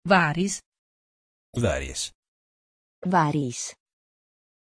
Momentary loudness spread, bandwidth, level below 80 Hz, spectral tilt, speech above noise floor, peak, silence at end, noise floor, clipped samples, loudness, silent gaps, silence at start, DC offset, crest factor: 14 LU; 11 kHz; -48 dBFS; -4.5 dB/octave; over 66 dB; -6 dBFS; 0.9 s; under -90 dBFS; under 0.1%; -26 LUFS; 0.66-0.72 s, 0.78-1.53 s, 2.15-3.02 s; 0.05 s; under 0.1%; 22 dB